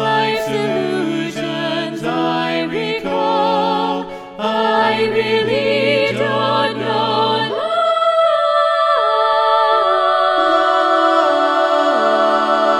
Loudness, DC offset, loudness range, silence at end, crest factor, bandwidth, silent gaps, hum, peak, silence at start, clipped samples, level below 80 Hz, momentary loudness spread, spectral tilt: -16 LUFS; under 0.1%; 5 LU; 0 s; 14 dB; 13.5 kHz; none; none; -2 dBFS; 0 s; under 0.1%; -58 dBFS; 7 LU; -5 dB/octave